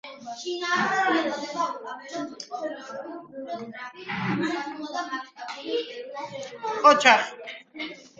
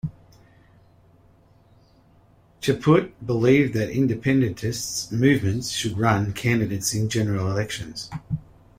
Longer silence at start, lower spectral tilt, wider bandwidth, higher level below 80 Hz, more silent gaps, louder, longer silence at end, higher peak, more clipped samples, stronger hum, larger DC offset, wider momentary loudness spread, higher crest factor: about the same, 0.05 s vs 0.05 s; second, -3.5 dB/octave vs -5.5 dB/octave; second, 9.2 kHz vs 16 kHz; second, -72 dBFS vs -52 dBFS; neither; about the same, -25 LUFS vs -23 LUFS; second, 0.1 s vs 0.4 s; first, 0 dBFS vs -4 dBFS; neither; neither; neither; first, 19 LU vs 12 LU; first, 26 dB vs 20 dB